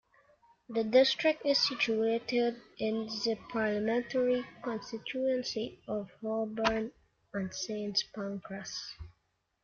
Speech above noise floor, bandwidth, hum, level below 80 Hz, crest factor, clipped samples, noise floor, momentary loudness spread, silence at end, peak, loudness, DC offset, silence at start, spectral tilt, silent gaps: 46 dB; 7.2 kHz; none; -64 dBFS; 20 dB; under 0.1%; -78 dBFS; 11 LU; 0.55 s; -14 dBFS; -32 LUFS; under 0.1%; 0.7 s; -4 dB/octave; none